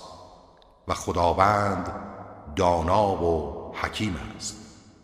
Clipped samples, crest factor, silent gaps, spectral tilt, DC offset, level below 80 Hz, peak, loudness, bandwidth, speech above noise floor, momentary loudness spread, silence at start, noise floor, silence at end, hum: under 0.1%; 24 dB; none; -5.5 dB/octave; under 0.1%; -44 dBFS; -4 dBFS; -25 LUFS; 15 kHz; 30 dB; 19 LU; 0 s; -54 dBFS; 0.3 s; none